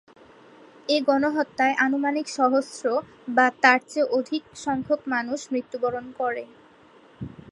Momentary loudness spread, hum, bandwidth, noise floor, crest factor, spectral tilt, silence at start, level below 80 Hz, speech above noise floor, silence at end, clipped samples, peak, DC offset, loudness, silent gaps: 12 LU; none; 11.5 kHz; -53 dBFS; 24 dB; -4 dB/octave; 0.9 s; -64 dBFS; 29 dB; 0.25 s; under 0.1%; -2 dBFS; under 0.1%; -24 LUFS; none